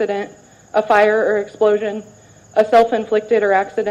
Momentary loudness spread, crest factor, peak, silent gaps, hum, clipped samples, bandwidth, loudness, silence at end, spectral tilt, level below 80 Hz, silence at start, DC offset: 11 LU; 14 dB; -2 dBFS; none; none; under 0.1%; 9.4 kHz; -16 LUFS; 0 s; -5 dB/octave; -58 dBFS; 0 s; under 0.1%